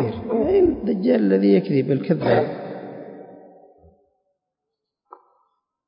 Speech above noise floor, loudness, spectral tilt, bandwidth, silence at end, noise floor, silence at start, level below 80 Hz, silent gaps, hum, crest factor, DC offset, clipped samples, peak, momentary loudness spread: 64 dB; -19 LUFS; -12.5 dB/octave; 5.4 kHz; 2.55 s; -82 dBFS; 0 s; -50 dBFS; none; none; 18 dB; under 0.1%; under 0.1%; -6 dBFS; 19 LU